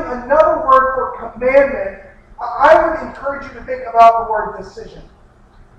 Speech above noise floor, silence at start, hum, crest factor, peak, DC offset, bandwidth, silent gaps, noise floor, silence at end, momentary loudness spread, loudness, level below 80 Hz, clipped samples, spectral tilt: 30 dB; 0 s; none; 16 dB; 0 dBFS; under 0.1%; 8 kHz; none; -45 dBFS; 0.75 s; 17 LU; -13 LUFS; -40 dBFS; under 0.1%; -5.5 dB/octave